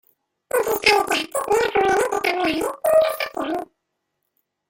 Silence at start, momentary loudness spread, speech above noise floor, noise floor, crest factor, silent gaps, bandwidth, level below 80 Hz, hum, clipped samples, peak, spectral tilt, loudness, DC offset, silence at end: 0.55 s; 9 LU; 57 dB; -77 dBFS; 20 dB; none; 17 kHz; -56 dBFS; none; under 0.1%; -2 dBFS; -2.5 dB/octave; -20 LUFS; under 0.1%; 1.05 s